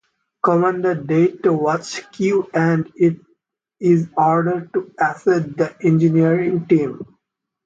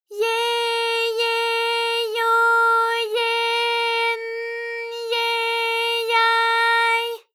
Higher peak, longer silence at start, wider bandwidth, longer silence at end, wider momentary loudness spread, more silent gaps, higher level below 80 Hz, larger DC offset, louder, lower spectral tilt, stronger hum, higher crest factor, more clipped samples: first, -4 dBFS vs -8 dBFS; first, 0.45 s vs 0.1 s; second, 7.8 kHz vs 18 kHz; first, 0.6 s vs 0.15 s; about the same, 7 LU vs 8 LU; neither; first, -62 dBFS vs under -90 dBFS; neither; about the same, -18 LUFS vs -20 LUFS; first, -7.5 dB/octave vs 4 dB/octave; neither; about the same, 16 dB vs 14 dB; neither